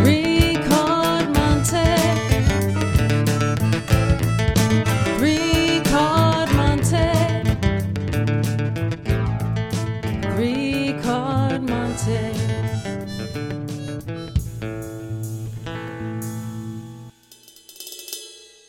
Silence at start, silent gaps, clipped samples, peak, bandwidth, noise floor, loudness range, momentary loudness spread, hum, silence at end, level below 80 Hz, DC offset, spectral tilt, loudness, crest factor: 0 s; none; under 0.1%; -4 dBFS; 16.5 kHz; -49 dBFS; 11 LU; 13 LU; 60 Hz at -40 dBFS; 0.25 s; -32 dBFS; under 0.1%; -5.5 dB/octave; -21 LUFS; 18 dB